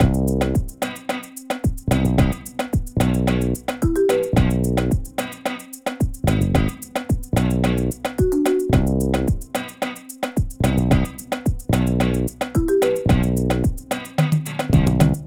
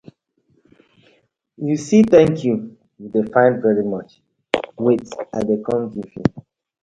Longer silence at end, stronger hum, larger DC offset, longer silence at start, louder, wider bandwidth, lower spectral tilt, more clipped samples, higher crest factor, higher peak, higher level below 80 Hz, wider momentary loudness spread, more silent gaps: second, 0 s vs 0.4 s; neither; neither; second, 0 s vs 1.6 s; second, -21 LUFS vs -18 LUFS; first, 19.5 kHz vs 9 kHz; about the same, -6.5 dB/octave vs -7 dB/octave; neither; about the same, 16 dB vs 20 dB; about the same, -2 dBFS vs 0 dBFS; first, -28 dBFS vs -52 dBFS; second, 10 LU vs 15 LU; neither